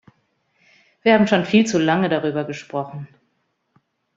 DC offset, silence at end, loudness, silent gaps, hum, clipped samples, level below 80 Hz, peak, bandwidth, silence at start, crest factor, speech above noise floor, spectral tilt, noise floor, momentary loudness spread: under 0.1%; 1.1 s; -19 LUFS; none; none; under 0.1%; -62 dBFS; -2 dBFS; 7.8 kHz; 1.05 s; 20 dB; 51 dB; -5.5 dB/octave; -70 dBFS; 15 LU